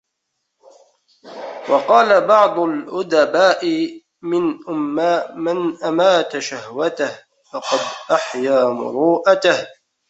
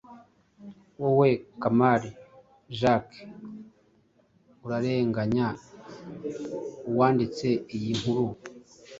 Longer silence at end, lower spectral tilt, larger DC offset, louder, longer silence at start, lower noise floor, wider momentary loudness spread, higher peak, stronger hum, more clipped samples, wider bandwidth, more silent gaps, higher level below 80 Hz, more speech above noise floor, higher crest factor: first, 0.4 s vs 0 s; second, -4 dB/octave vs -7 dB/octave; neither; first, -17 LUFS vs -27 LUFS; first, 1.25 s vs 0.1 s; first, -75 dBFS vs -64 dBFS; second, 13 LU vs 22 LU; first, -2 dBFS vs -8 dBFS; neither; neither; about the same, 8.2 kHz vs 7.8 kHz; neither; second, -68 dBFS vs -60 dBFS; first, 58 dB vs 38 dB; about the same, 16 dB vs 20 dB